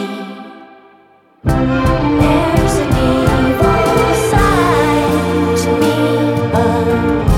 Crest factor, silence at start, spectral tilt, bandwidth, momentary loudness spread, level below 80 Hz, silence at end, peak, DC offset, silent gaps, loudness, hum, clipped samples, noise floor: 12 dB; 0 s; -6.5 dB/octave; 16.5 kHz; 4 LU; -24 dBFS; 0 s; 0 dBFS; under 0.1%; none; -13 LUFS; none; under 0.1%; -48 dBFS